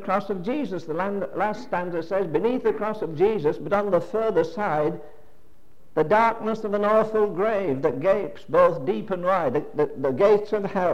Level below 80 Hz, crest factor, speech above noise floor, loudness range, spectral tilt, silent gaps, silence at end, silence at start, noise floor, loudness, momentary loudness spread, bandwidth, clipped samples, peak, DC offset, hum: -54 dBFS; 16 dB; 35 dB; 3 LU; -7.5 dB/octave; none; 0 s; 0 s; -58 dBFS; -24 LUFS; 8 LU; 8.4 kHz; under 0.1%; -8 dBFS; 1%; none